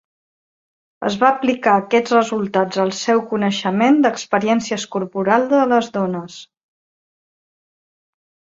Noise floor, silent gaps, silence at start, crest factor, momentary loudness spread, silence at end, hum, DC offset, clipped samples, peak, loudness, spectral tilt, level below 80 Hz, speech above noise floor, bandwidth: under -90 dBFS; none; 1 s; 18 dB; 8 LU; 2.1 s; none; under 0.1%; under 0.1%; -2 dBFS; -17 LUFS; -5 dB/octave; -64 dBFS; over 73 dB; 7.8 kHz